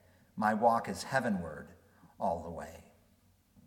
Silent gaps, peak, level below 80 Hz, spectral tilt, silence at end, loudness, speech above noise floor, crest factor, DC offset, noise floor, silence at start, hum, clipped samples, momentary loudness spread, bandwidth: none; -14 dBFS; -64 dBFS; -5.5 dB/octave; 0.85 s; -33 LUFS; 35 dB; 22 dB; under 0.1%; -68 dBFS; 0.35 s; none; under 0.1%; 20 LU; 17.5 kHz